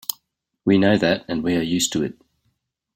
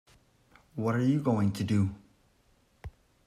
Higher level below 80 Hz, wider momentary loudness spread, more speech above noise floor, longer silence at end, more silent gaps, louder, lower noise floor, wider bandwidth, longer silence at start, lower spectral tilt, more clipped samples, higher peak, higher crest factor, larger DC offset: about the same, -56 dBFS vs -60 dBFS; second, 13 LU vs 23 LU; first, 52 dB vs 39 dB; first, 0.85 s vs 0.4 s; neither; first, -21 LUFS vs -29 LUFS; first, -71 dBFS vs -67 dBFS; first, 16.5 kHz vs 14 kHz; second, 0.1 s vs 0.75 s; second, -4.5 dB/octave vs -8 dB/octave; neither; first, -2 dBFS vs -16 dBFS; about the same, 20 dB vs 16 dB; neither